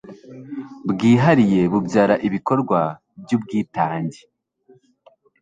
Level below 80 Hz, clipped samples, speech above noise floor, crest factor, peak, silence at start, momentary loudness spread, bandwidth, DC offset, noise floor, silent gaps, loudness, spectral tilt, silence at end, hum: -56 dBFS; under 0.1%; 37 dB; 18 dB; -2 dBFS; 0.05 s; 19 LU; 9.2 kHz; under 0.1%; -55 dBFS; none; -19 LUFS; -7.5 dB/octave; 1.3 s; none